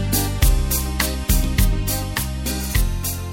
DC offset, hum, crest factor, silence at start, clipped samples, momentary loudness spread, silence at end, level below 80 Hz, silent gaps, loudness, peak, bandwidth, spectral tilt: under 0.1%; none; 16 dB; 0 s; under 0.1%; 6 LU; 0 s; -22 dBFS; none; -21 LUFS; -2 dBFS; 17 kHz; -4 dB/octave